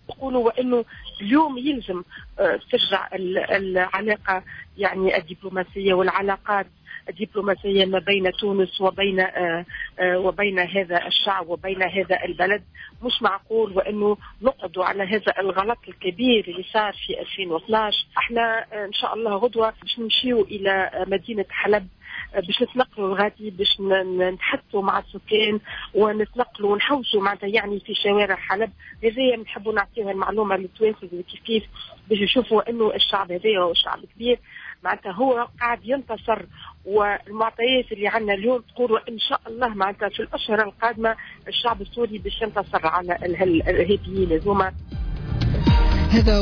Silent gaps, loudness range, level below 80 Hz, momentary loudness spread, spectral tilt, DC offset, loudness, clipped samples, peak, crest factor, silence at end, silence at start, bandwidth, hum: none; 2 LU; -36 dBFS; 8 LU; -7 dB/octave; under 0.1%; -22 LUFS; under 0.1%; -6 dBFS; 16 dB; 0 s; 0.1 s; 5.4 kHz; none